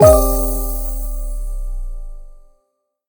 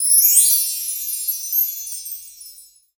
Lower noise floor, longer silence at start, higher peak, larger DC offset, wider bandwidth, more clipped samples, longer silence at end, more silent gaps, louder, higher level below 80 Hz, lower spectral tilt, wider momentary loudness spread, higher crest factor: first, -69 dBFS vs -45 dBFS; about the same, 0 s vs 0 s; about the same, 0 dBFS vs 0 dBFS; neither; about the same, over 20 kHz vs over 20 kHz; neither; first, 0.7 s vs 0.35 s; neither; second, -19 LUFS vs -15 LUFS; first, -22 dBFS vs -68 dBFS; first, -6 dB/octave vs 7 dB/octave; about the same, 20 LU vs 20 LU; about the same, 18 dB vs 20 dB